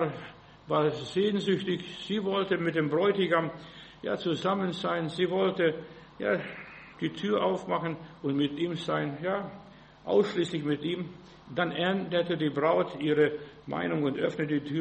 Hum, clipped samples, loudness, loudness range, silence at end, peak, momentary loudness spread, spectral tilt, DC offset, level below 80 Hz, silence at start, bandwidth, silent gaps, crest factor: none; under 0.1%; -29 LUFS; 3 LU; 0 s; -12 dBFS; 13 LU; -6.5 dB/octave; under 0.1%; -66 dBFS; 0 s; 8.4 kHz; none; 18 dB